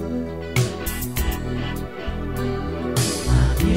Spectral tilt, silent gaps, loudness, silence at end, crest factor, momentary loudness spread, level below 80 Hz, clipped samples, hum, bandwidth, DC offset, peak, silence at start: -5 dB/octave; none; -24 LUFS; 0 s; 16 dB; 9 LU; -28 dBFS; under 0.1%; none; 16.5 kHz; 0.9%; -6 dBFS; 0 s